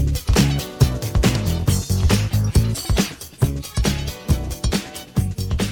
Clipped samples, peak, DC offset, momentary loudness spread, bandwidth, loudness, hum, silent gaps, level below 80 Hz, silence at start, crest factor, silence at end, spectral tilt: under 0.1%; -4 dBFS; under 0.1%; 6 LU; 18 kHz; -21 LUFS; none; none; -26 dBFS; 0 s; 16 dB; 0 s; -5 dB/octave